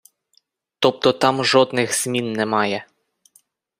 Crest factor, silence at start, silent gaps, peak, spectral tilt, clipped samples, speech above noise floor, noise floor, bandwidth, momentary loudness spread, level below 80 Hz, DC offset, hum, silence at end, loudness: 20 dB; 0.8 s; none; -2 dBFS; -3.5 dB/octave; under 0.1%; 45 dB; -63 dBFS; 15.5 kHz; 6 LU; -64 dBFS; under 0.1%; none; 0.95 s; -19 LUFS